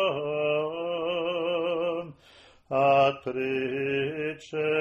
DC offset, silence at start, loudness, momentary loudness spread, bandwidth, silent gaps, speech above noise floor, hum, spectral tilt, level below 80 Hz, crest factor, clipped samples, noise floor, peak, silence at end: under 0.1%; 0 s; -27 LUFS; 9 LU; 8.4 kHz; none; 27 dB; none; -6.5 dB/octave; -66 dBFS; 16 dB; under 0.1%; -55 dBFS; -10 dBFS; 0 s